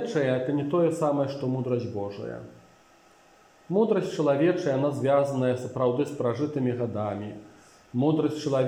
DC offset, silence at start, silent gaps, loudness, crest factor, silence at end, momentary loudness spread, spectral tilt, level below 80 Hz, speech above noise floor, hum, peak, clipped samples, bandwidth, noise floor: under 0.1%; 0 s; none; -26 LUFS; 16 dB; 0 s; 11 LU; -7.5 dB/octave; -70 dBFS; 32 dB; none; -10 dBFS; under 0.1%; 15 kHz; -57 dBFS